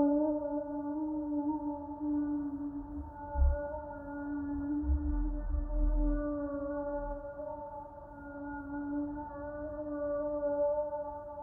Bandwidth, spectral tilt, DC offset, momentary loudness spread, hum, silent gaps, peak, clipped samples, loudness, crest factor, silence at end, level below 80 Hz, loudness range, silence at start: 1.9 kHz; -13 dB/octave; under 0.1%; 10 LU; none; none; -18 dBFS; under 0.1%; -36 LUFS; 16 dB; 0 s; -38 dBFS; 4 LU; 0 s